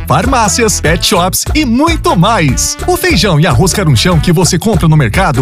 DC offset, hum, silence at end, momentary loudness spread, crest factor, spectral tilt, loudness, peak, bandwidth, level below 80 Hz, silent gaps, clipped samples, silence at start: under 0.1%; none; 0 s; 2 LU; 8 dB; -4.5 dB/octave; -9 LUFS; 0 dBFS; 16 kHz; -20 dBFS; none; under 0.1%; 0 s